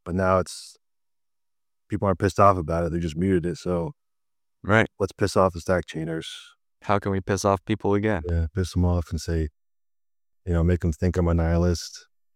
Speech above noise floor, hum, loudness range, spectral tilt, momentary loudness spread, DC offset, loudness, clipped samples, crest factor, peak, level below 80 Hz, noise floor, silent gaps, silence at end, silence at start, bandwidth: over 67 dB; none; 2 LU; -6.5 dB/octave; 12 LU; under 0.1%; -24 LUFS; under 0.1%; 22 dB; -4 dBFS; -38 dBFS; under -90 dBFS; none; 0.35 s; 0.05 s; 13.5 kHz